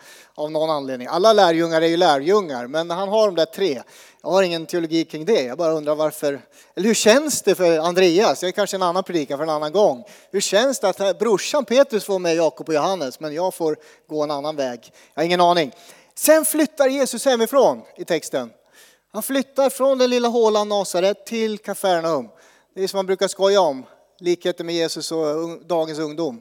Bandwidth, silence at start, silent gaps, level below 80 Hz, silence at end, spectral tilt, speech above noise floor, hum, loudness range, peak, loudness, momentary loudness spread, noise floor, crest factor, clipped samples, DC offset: over 20 kHz; 0.1 s; none; -78 dBFS; 0 s; -3.5 dB/octave; 33 dB; none; 4 LU; -2 dBFS; -20 LUFS; 11 LU; -53 dBFS; 18 dB; under 0.1%; under 0.1%